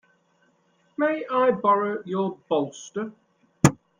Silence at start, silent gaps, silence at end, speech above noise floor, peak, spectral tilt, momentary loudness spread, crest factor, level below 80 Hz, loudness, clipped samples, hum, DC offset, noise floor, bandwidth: 1 s; none; 0.25 s; 41 dB; -2 dBFS; -6 dB/octave; 12 LU; 24 dB; -58 dBFS; -24 LUFS; under 0.1%; none; under 0.1%; -65 dBFS; 16 kHz